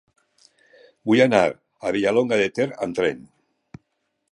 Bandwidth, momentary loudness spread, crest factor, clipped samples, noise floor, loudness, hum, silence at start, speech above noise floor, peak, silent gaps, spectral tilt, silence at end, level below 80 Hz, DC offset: 11 kHz; 12 LU; 20 dB; under 0.1%; -74 dBFS; -21 LUFS; none; 1.05 s; 54 dB; -4 dBFS; none; -5.5 dB/octave; 1.1 s; -60 dBFS; under 0.1%